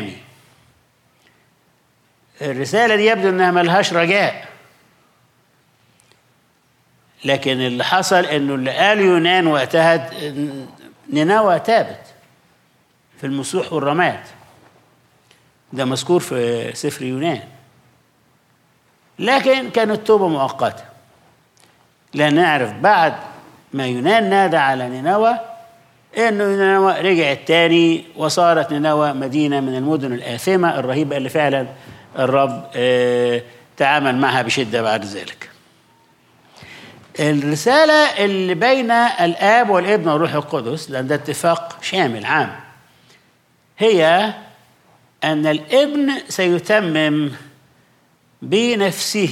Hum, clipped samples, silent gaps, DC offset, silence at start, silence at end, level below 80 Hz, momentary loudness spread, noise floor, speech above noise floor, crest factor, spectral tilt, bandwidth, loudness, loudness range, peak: none; under 0.1%; none; under 0.1%; 0 s; 0 s; -70 dBFS; 12 LU; -59 dBFS; 43 dB; 16 dB; -4.5 dB/octave; 16 kHz; -17 LUFS; 7 LU; -2 dBFS